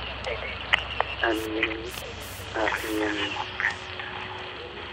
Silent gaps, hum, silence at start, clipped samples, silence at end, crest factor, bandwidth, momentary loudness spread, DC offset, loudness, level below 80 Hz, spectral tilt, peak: none; none; 0 s; under 0.1%; 0 s; 26 dB; 16 kHz; 11 LU; under 0.1%; -29 LUFS; -46 dBFS; -3.5 dB/octave; -4 dBFS